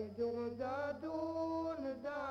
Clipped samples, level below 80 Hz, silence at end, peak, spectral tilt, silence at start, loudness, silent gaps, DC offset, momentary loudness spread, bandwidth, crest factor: under 0.1%; -70 dBFS; 0 s; -28 dBFS; -7 dB/octave; 0 s; -41 LUFS; none; under 0.1%; 3 LU; 7.8 kHz; 12 dB